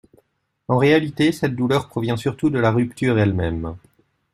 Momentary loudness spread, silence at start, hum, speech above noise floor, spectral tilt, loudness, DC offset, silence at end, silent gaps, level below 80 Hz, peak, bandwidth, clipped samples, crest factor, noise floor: 8 LU; 0.7 s; none; 44 dB; -7 dB/octave; -20 LUFS; under 0.1%; 0.55 s; none; -48 dBFS; -4 dBFS; 14 kHz; under 0.1%; 18 dB; -63 dBFS